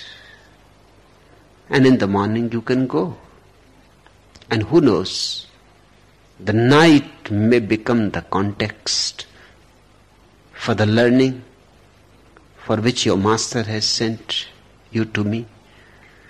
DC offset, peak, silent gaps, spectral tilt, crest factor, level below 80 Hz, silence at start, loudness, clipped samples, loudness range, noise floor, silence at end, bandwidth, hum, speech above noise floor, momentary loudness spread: under 0.1%; -4 dBFS; none; -5 dB/octave; 16 dB; -48 dBFS; 0 s; -18 LUFS; under 0.1%; 5 LU; -52 dBFS; 0.85 s; 12.5 kHz; 50 Hz at -50 dBFS; 34 dB; 13 LU